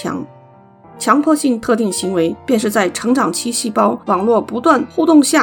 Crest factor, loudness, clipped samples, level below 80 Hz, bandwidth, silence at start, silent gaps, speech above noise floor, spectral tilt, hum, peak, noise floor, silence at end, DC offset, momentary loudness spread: 16 dB; -15 LUFS; under 0.1%; -56 dBFS; 19.5 kHz; 0 s; none; 29 dB; -4 dB/octave; none; 0 dBFS; -43 dBFS; 0 s; under 0.1%; 6 LU